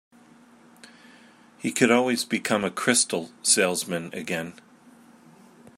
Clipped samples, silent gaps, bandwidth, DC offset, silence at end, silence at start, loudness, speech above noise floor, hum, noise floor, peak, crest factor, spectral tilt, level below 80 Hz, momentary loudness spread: under 0.1%; none; 16 kHz; under 0.1%; 1.25 s; 1.6 s; -23 LUFS; 29 dB; none; -54 dBFS; -4 dBFS; 24 dB; -2.5 dB/octave; -72 dBFS; 11 LU